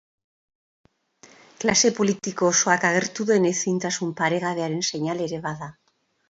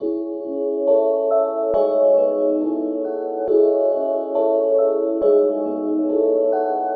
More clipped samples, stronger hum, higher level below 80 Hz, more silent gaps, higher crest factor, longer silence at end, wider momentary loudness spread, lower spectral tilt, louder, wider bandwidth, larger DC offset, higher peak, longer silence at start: neither; neither; about the same, -64 dBFS vs -62 dBFS; neither; first, 20 dB vs 12 dB; first, 0.6 s vs 0 s; about the same, 10 LU vs 8 LU; second, -3.5 dB/octave vs -7 dB/octave; second, -22 LUFS vs -19 LUFS; first, 8 kHz vs 4.7 kHz; neither; about the same, -4 dBFS vs -6 dBFS; first, 1.25 s vs 0 s